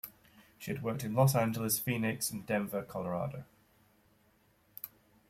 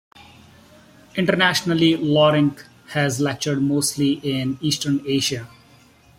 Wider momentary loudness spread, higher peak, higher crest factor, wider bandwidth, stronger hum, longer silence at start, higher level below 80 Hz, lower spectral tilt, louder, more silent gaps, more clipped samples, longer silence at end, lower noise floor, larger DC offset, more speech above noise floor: first, 19 LU vs 7 LU; second, -14 dBFS vs -2 dBFS; about the same, 20 dB vs 20 dB; about the same, 16.5 kHz vs 16.5 kHz; neither; second, 0.05 s vs 0.2 s; second, -68 dBFS vs -58 dBFS; about the same, -5 dB/octave vs -4.5 dB/octave; second, -33 LUFS vs -20 LUFS; neither; neither; second, 0.4 s vs 0.7 s; first, -69 dBFS vs -51 dBFS; neither; first, 36 dB vs 32 dB